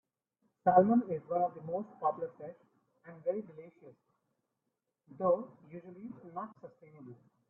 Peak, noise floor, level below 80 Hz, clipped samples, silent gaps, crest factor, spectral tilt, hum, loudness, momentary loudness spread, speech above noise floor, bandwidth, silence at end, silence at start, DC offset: -10 dBFS; -86 dBFS; -78 dBFS; under 0.1%; none; 26 dB; -12 dB/octave; none; -33 LUFS; 27 LU; 52 dB; 3.1 kHz; 0.35 s; 0.65 s; under 0.1%